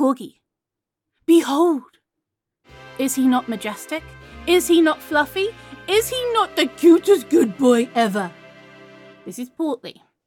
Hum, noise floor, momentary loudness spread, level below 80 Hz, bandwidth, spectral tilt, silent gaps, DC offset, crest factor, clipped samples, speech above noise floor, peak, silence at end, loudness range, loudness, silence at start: none; -85 dBFS; 17 LU; -54 dBFS; 17 kHz; -4 dB/octave; none; under 0.1%; 16 dB; under 0.1%; 67 dB; -4 dBFS; 0.35 s; 4 LU; -19 LUFS; 0 s